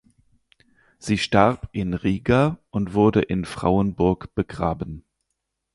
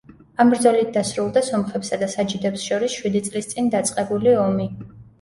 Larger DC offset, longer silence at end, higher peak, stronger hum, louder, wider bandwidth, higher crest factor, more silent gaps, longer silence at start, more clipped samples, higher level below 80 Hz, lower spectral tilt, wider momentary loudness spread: neither; first, 0.75 s vs 0.2 s; about the same, -2 dBFS vs -4 dBFS; neither; about the same, -22 LUFS vs -21 LUFS; about the same, 11.5 kHz vs 11.5 kHz; about the same, 20 dB vs 18 dB; neither; first, 1.05 s vs 0.4 s; neither; first, -42 dBFS vs -56 dBFS; first, -7 dB/octave vs -5 dB/octave; about the same, 10 LU vs 8 LU